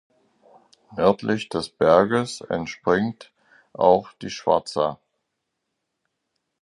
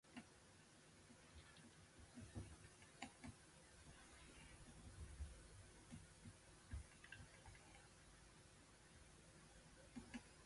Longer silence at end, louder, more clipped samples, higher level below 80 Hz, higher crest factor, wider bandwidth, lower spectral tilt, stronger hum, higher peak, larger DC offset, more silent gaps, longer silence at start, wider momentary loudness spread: first, 1.65 s vs 0 s; first, -22 LUFS vs -62 LUFS; neither; first, -56 dBFS vs -66 dBFS; about the same, 22 dB vs 26 dB; about the same, 11.5 kHz vs 11.5 kHz; first, -5.5 dB/octave vs -4 dB/octave; neither; first, -2 dBFS vs -36 dBFS; neither; neither; first, 0.9 s vs 0.05 s; about the same, 11 LU vs 9 LU